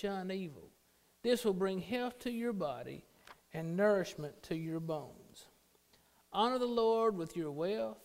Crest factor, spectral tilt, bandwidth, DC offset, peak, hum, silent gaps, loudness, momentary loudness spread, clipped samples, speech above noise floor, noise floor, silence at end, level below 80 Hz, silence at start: 18 dB; -6 dB/octave; 16 kHz; under 0.1%; -20 dBFS; none; none; -36 LUFS; 16 LU; under 0.1%; 35 dB; -71 dBFS; 0.05 s; -70 dBFS; 0 s